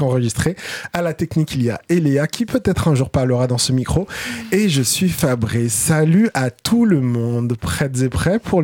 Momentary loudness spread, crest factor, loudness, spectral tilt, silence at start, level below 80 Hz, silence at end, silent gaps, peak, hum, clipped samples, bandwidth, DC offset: 6 LU; 12 dB; -18 LUFS; -5.5 dB/octave; 0 s; -38 dBFS; 0 s; none; -4 dBFS; none; under 0.1%; 17.5 kHz; under 0.1%